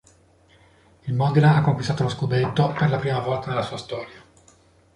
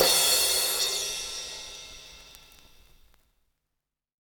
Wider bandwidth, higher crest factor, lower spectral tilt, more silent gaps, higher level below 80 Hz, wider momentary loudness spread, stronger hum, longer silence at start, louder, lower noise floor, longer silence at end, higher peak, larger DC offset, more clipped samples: second, 10.5 kHz vs over 20 kHz; second, 18 dB vs 24 dB; first, -7.5 dB/octave vs 1 dB/octave; neither; first, -52 dBFS vs -58 dBFS; second, 16 LU vs 24 LU; neither; first, 1.05 s vs 0 s; about the same, -22 LUFS vs -24 LUFS; second, -56 dBFS vs -85 dBFS; second, 0.8 s vs 1.9 s; about the same, -6 dBFS vs -6 dBFS; neither; neither